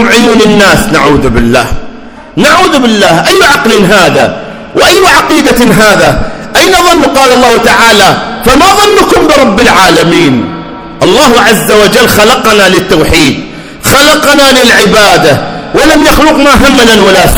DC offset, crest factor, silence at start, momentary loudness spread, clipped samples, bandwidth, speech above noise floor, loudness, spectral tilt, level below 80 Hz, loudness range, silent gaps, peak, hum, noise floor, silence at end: under 0.1%; 4 dB; 0 s; 8 LU; 20%; over 20 kHz; 20 dB; -4 LUFS; -3.5 dB/octave; -22 dBFS; 2 LU; none; 0 dBFS; none; -24 dBFS; 0 s